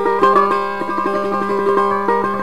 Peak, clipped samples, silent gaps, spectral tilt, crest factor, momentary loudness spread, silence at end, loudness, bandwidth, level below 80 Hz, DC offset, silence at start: -2 dBFS; under 0.1%; none; -6.5 dB/octave; 14 dB; 6 LU; 0 s; -16 LUFS; 12.5 kHz; -50 dBFS; 2%; 0 s